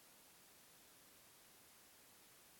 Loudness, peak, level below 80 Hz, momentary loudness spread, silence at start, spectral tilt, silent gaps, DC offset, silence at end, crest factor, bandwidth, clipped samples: -64 LUFS; -54 dBFS; -90 dBFS; 0 LU; 0 s; -1 dB/octave; none; under 0.1%; 0 s; 14 dB; 17 kHz; under 0.1%